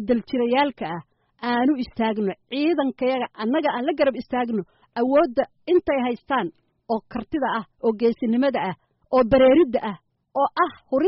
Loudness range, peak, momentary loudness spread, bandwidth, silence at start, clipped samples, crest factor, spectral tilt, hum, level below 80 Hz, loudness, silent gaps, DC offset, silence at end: 3 LU; -8 dBFS; 11 LU; 5.8 kHz; 0 s; under 0.1%; 14 dB; -4 dB/octave; none; -52 dBFS; -23 LUFS; none; under 0.1%; 0 s